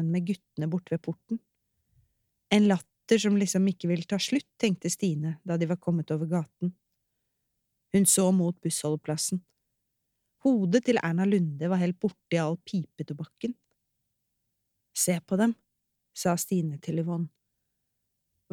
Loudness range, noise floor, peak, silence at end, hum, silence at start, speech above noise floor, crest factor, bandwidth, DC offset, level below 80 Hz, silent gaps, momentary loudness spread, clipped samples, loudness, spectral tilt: 5 LU; -80 dBFS; -8 dBFS; 1.25 s; none; 0 s; 53 dB; 22 dB; 16.5 kHz; under 0.1%; -74 dBFS; none; 12 LU; under 0.1%; -28 LUFS; -5 dB/octave